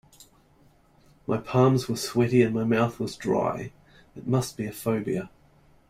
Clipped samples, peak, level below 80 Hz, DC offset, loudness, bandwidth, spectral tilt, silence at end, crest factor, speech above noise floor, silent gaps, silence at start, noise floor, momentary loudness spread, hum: under 0.1%; -6 dBFS; -58 dBFS; under 0.1%; -26 LUFS; 16 kHz; -6.5 dB/octave; 0.65 s; 20 dB; 34 dB; none; 1.3 s; -59 dBFS; 14 LU; none